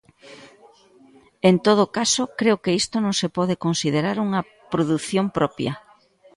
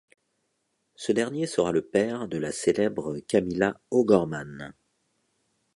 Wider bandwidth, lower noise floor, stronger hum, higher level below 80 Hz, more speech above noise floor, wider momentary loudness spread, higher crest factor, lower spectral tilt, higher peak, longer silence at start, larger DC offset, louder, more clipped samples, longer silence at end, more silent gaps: about the same, 11.5 kHz vs 11.5 kHz; second, -54 dBFS vs -76 dBFS; neither; about the same, -58 dBFS vs -60 dBFS; second, 33 dB vs 50 dB; second, 8 LU vs 13 LU; about the same, 20 dB vs 22 dB; about the same, -4.5 dB/octave vs -5.5 dB/octave; first, -2 dBFS vs -6 dBFS; second, 0.25 s vs 1 s; neither; first, -21 LUFS vs -26 LUFS; neither; second, 0.6 s vs 1.05 s; neither